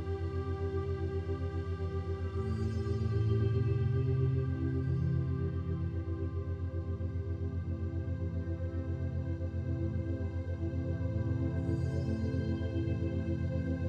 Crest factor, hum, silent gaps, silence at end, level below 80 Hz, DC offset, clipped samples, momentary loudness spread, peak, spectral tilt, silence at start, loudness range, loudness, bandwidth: 14 dB; none; none; 0 s; -44 dBFS; under 0.1%; under 0.1%; 6 LU; -20 dBFS; -9.5 dB/octave; 0 s; 5 LU; -35 LUFS; 6.6 kHz